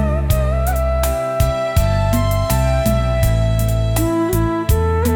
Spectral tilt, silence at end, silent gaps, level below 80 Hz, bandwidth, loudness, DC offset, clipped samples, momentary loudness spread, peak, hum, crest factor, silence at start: -6.5 dB/octave; 0 s; none; -20 dBFS; 18 kHz; -17 LUFS; under 0.1%; under 0.1%; 2 LU; -2 dBFS; none; 12 dB; 0 s